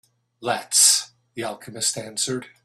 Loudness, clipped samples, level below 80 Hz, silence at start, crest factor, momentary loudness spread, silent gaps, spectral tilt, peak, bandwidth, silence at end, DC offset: -19 LUFS; under 0.1%; -70 dBFS; 0.4 s; 22 dB; 18 LU; none; -0.5 dB/octave; -2 dBFS; 15.5 kHz; 0.15 s; under 0.1%